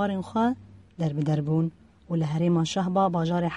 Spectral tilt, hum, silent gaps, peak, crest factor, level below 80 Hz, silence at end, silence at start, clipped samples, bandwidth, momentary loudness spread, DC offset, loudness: -7 dB/octave; none; none; -10 dBFS; 14 dB; -58 dBFS; 0 s; 0 s; under 0.1%; 9 kHz; 7 LU; under 0.1%; -26 LUFS